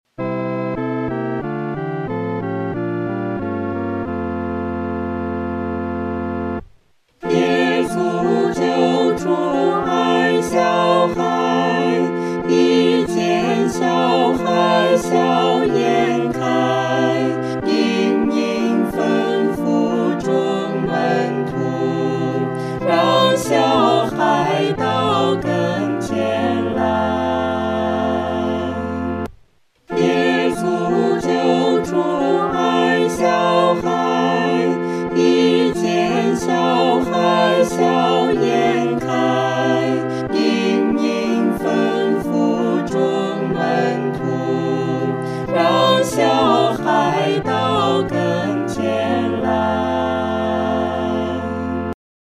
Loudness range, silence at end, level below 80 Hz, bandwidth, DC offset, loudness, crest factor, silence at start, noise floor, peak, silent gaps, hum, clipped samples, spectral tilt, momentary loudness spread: 5 LU; 0.4 s; -50 dBFS; 14.5 kHz; under 0.1%; -18 LUFS; 16 dB; 0.2 s; -54 dBFS; -2 dBFS; none; none; under 0.1%; -6 dB/octave; 8 LU